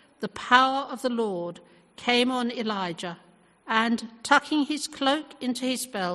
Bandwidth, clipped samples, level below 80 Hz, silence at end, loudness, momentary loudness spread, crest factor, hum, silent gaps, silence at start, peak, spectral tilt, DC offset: 12.5 kHz; under 0.1%; -68 dBFS; 0 s; -25 LUFS; 14 LU; 24 dB; none; none; 0.2 s; -4 dBFS; -3 dB/octave; under 0.1%